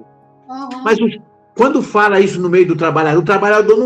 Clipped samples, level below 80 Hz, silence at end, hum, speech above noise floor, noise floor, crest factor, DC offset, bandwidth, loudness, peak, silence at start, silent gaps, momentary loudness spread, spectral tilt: under 0.1%; -56 dBFS; 0 s; none; 31 dB; -43 dBFS; 12 dB; under 0.1%; 8.8 kHz; -13 LUFS; 0 dBFS; 0.5 s; none; 16 LU; -6.5 dB/octave